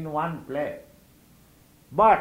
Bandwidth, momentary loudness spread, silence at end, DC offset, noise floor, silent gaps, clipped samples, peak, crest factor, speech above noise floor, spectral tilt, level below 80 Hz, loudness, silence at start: 16 kHz; 13 LU; 0 s; under 0.1%; -56 dBFS; none; under 0.1%; -6 dBFS; 20 dB; 33 dB; -7 dB/octave; -56 dBFS; -26 LUFS; 0 s